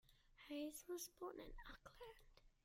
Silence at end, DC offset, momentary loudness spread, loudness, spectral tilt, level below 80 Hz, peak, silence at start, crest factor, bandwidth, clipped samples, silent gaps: 0.15 s; under 0.1%; 12 LU; -54 LUFS; -3 dB/octave; -68 dBFS; -40 dBFS; 0.05 s; 16 dB; 16.5 kHz; under 0.1%; none